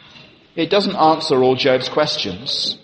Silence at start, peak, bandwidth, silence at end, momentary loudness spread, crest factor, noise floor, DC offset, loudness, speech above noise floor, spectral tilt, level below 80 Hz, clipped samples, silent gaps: 0.15 s; -2 dBFS; 8.8 kHz; 0.05 s; 7 LU; 16 dB; -45 dBFS; under 0.1%; -17 LUFS; 28 dB; -4.5 dB/octave; -60 dBFS; under 0.1%; none